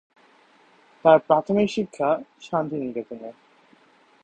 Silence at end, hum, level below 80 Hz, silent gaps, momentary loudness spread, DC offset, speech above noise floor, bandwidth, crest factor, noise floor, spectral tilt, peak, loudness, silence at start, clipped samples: 0.95 s; none; -64 dBFS; none; 17 LU; under 0.1%; 35 dB; 8.8 kHz; 24 dB; -57 dBFS; -6.5 dB/octave; -2 dBFS; -23 LUFS; 1.05 s; under 0.1%